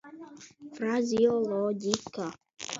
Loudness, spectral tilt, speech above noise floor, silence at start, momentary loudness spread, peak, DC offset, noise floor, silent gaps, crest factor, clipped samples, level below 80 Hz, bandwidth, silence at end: -29 LUFS; -4.5 dB/octave; 20 dB; 0.05 s; 22 LU; -4 dBFS; under 0.1%; -48 dBFS; none; 26 dB; under 0.1%; -70 dBFS; 7.8 kHz; 0 s